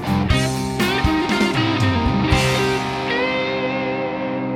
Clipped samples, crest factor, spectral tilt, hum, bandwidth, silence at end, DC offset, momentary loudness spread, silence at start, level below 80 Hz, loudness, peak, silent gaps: under 0.1%; 16 dB; -5.5 dB/octave; none; 17 kHz; 0 s; under 0.1%; 5 LU; 0 s; -32 dBFS; -19 LUFS; -4 dBFS; none